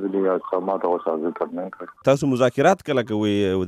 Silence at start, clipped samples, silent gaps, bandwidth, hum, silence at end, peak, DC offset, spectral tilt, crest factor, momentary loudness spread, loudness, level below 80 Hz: 0 s; under 0.1%; none; 14 kHz; none; 0 s; -4 dBFS; under 0.1%; -6.5 dB/octave; 16 dB; 10 LU; -22 LUFS; -62 dBFS